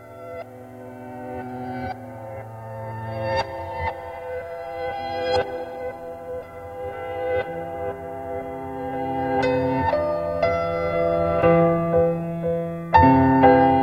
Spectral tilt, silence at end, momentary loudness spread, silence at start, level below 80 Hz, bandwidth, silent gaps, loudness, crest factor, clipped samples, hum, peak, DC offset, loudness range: -8 dB/octave; 0 s; 20 LU; 0 s; -46 dBFS; 9.2 kHz; none; -23 LUFS; 22 dB; under 0.1%; none; -2 dBFS; under 0.1%; 11 LU